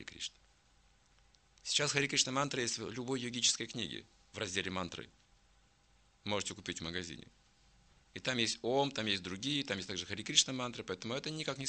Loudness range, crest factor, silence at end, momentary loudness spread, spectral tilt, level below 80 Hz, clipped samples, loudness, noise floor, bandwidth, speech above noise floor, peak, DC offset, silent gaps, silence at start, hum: 8 LU; 26 dB; 0 s; 14 LU; -2.5 dB/octave; -68 dBFS; under 0.1%; -35 LUFS; -69 dBFS; 8.8 kHz; 32 dB; -12 dBFS; under 0.1%; none; 0 s; none